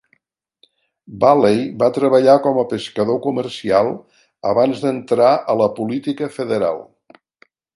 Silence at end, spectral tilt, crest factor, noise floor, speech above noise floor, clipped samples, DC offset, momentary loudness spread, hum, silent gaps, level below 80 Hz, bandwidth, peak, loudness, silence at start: 0.9 s; -6.5 dB/octave; 18 dB; -63 dBFS; 47 dB; under 0.1%; under 0.1%; 10 LU; none; none; -60 dBFS; 11.5 kHz; 0 dBFS; -17 LUFS; 1.1 s